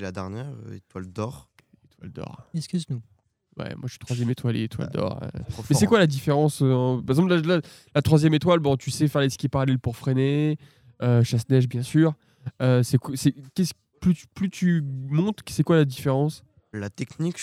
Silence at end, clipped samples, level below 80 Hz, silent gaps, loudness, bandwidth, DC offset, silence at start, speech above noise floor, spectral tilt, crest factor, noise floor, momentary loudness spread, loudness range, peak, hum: 0 s; under 0.1%; -54 dBFS; none; -24 LUFS; 15 kHz; under 0.1%; 0 s; 36 dB; -6.5 dB/octave; 18 dB; -59 dBFS; 15 LU; 11 LU; -4 dBFS; none